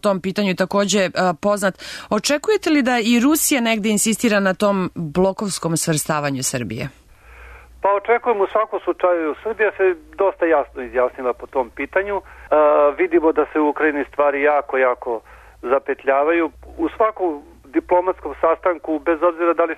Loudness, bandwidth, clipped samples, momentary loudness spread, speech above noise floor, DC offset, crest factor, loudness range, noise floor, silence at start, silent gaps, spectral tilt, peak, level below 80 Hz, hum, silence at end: -19 LUFS; 13.5 kHz; under 0.1%; 8 LU; 24 dB; under 0.1%; 14 dB; 4 LU; -43 dBFS; 0.05 s; none; -4 dB/octave; -4 dBFS; -50 dBFS; none; 0 s